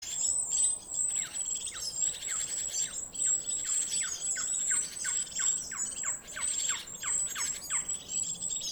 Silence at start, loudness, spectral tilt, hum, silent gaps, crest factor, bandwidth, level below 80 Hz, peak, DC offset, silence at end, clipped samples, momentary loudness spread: 0 s; -30 LUFS; 1.5 dB/octave; none; none; 18 dB; over 20 kHz; -62 dBFS; -16 dBFS; under 0.1%; 0 s; under 0.1%; 5 LU